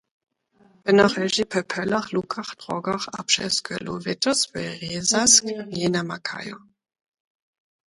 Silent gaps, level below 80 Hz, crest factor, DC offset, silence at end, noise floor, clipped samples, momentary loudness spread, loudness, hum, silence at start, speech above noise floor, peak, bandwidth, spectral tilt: none; -60 dBFS; 24 dB; under 0.1%; 1.35 s; -59 dBFS; under 0.1%; 14 LU; -22 LUFS; none; 0.85 s; 36 dB; 0 dBFS; 11.5 kHz; -2.5 dB/octave